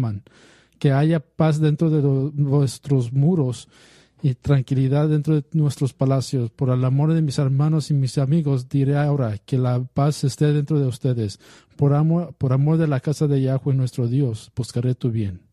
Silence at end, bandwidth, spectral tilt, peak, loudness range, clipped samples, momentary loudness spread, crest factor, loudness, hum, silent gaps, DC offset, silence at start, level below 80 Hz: 0.15 s; 12 kHz; -8 dB/octave; -6 dBFS; 1 LU; under 0.1%; 6 LU; 14 dB; -21 LUFS; none; none; under 0.1%; 0 s; -54 dBFS